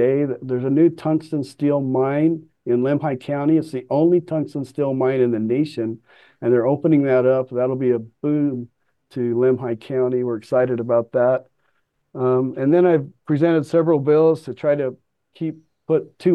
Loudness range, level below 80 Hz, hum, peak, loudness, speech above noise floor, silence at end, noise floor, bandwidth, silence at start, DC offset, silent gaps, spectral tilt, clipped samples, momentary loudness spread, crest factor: 3 LU; -70 dBFS; none; -6 dBFS; -20 LUFS; 50 dB; 0 s; -69 dBFS; 9.8 kHz; 0 s; under 0.1%; none; -9.5 dB/octave; under 0.1%; 11 LU; 14 dB